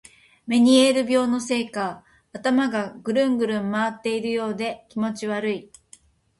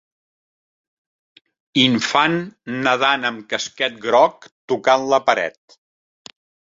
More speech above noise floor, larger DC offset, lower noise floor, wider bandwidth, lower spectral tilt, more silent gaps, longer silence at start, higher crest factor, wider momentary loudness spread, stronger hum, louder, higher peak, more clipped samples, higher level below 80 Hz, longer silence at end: second, 32 dB vs over 72 dB; neither; second, -54 dBFS vs under -90 dBFS; first, 11.5 kHz vs 7.8 kHz; about the same, -4.5 dB/octave vs -4 dB/octave; second, none vs 4.52-4.68 s; second, 0.45 s vs 1.75 s; about the same, 18 dB vs 20 dB; first, 12 LU vs 9 LU; neither; second, -23 LUFS vs -18 LUFS; second, -6 dBFS vs -2 dBFS; neither; about the same, -64 dBFS vs -64 dBFS; second, 0.75 s vs 1.25 s